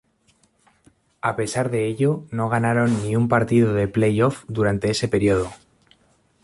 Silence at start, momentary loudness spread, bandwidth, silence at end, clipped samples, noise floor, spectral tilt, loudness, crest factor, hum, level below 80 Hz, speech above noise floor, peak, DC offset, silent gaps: 1.25 s; 6 LU; 11.5 kHz; 0.9 s; under 0.1%; -62 dBFS; -6.5 dB/octave; -21 LUFS; 18 dB; none; -48 dBFS; 42 dB; -4 dBFS; under 0.1%; none